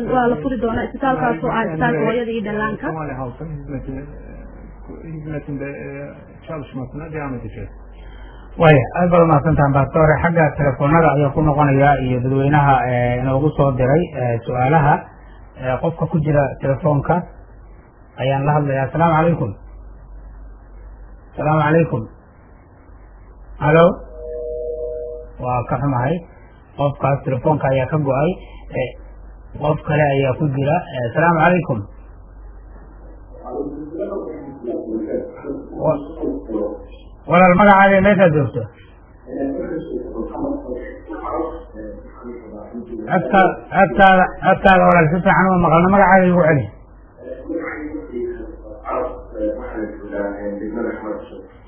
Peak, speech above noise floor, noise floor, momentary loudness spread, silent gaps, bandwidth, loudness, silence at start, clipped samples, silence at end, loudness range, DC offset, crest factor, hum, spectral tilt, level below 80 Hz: 0 dBFS; 28 dB; -45 dBFS; 19 LU; none; 3.5 kHz; -17 LUFS; 0 s; under 0.1%; 0.2 s; 13 LU; under 0.1%; 18 dB; none; -11.5 dB/octave; -38 dBFS